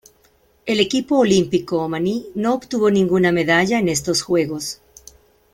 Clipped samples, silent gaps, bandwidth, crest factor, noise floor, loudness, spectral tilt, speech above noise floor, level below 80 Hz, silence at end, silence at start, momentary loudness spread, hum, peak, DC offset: under 0.1%; none; 16.5 kHz; 16 dB; -57 dBFS; -18 LUFS; -4.5 dB/octave; 39 dB; -52 dBFS; 0.8 s; 0.65 s; 8 LU; none; -2 dBFS; under 0.1%